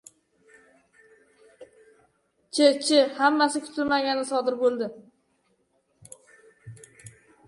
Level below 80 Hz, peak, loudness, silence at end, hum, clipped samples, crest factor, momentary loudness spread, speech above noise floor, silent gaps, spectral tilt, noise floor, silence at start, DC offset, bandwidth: -72 dBFS; -6 dBFS; -23 LUFS; 0.4 s; none; under 0.1%; 22 dB; 16 LU; 47 dB; none; -3 dB/octave; -70 dBFS; 1.6 s; under 0.1%; 11.5 kHz